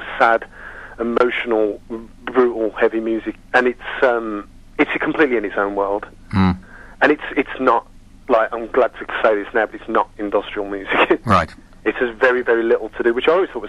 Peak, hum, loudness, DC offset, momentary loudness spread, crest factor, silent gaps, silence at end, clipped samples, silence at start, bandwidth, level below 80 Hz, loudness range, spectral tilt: -2 dBFS; none; -19 LUFS; under 0.1%; 10 LU; 16 dB; none; 0 s; under 0.1%; 0 s; 11.5 kHz; -44 dBFS; 1 LU; -7 dB/octave